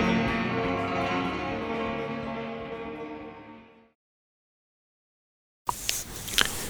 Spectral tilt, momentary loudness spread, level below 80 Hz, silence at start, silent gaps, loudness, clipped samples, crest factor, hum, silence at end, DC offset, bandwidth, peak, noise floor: -3.5 dB/octave; 14 LU; -50 dBFS; 0 s; 3.95-5.65 s; -30 LUFS; under 0.1%; 30 dB; none; 0 s; under 0.1%; over 20 kHz; -2 dBFS; -50 dBFS